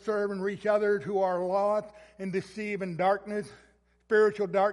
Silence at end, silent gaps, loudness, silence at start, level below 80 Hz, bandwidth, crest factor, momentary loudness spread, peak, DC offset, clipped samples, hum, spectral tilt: 0 s; none; -29 LUFS; 0.05 s; -68 dBFS; 11.5 kHz; 16 dB; 12 LU; -14 dBFS; under 0.1%; under 0.1%; none; -6.5 dB/octave